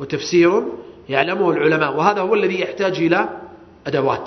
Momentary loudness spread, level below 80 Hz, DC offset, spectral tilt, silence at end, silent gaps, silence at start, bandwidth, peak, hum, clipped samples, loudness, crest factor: 12 LU; -58 dBFS; under 0.1%; -5.5 dB/octave; 0 s; none; 0 s; 6.4 kHz; 0 dBFS; none; under 0.1%; -18 LUFS; 18 dB